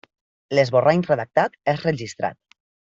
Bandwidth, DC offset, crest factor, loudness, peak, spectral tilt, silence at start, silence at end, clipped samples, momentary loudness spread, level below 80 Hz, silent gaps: 7.8 kHz; under 0.1%; 18 dB; -21 LUFS; -4 dBFS; -6.5 dB/octave; 0.5 s; 0.65 s; under 0.1%; 11 LU; -62 dBFS; none